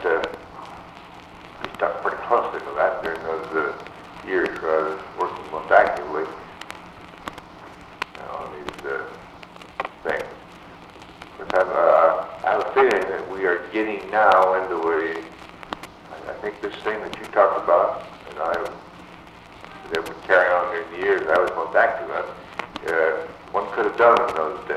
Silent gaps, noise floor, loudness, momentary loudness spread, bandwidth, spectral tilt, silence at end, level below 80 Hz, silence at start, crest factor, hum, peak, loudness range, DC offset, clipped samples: none; -43 dBFS; -22 LUFS; 24 LU; 13 kHz; -5 dB/octave; 0 s; -56 dBFS; 0 s; 22 dB; none; 0 dBFS; 11 LU; under 0.1%; under 0.1%